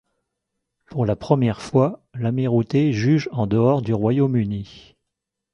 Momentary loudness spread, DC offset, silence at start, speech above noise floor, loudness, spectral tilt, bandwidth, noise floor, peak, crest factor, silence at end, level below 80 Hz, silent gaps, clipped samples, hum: 9 LU; under 0.1%; 0.9 s; 62 dB; -21 LUFS; -8.5 dB/octave; 10 kHz; -82 dBFS; -2 dBFS; 18 dB; 0.75 s; -50 dBFS; none; under 0.1%; none